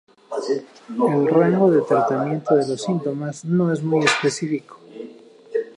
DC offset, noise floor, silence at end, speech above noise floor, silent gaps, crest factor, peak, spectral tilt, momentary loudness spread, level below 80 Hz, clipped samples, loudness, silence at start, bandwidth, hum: under 0.1%; -43 dBFS; 0.1 s; 23 dB; none; 18 dB; -2 dBFS; -6 dB/octave; 15 LU; -70 dBFS; under 0.1%; -20 LUFS; 0.3 s; 11 kHz; none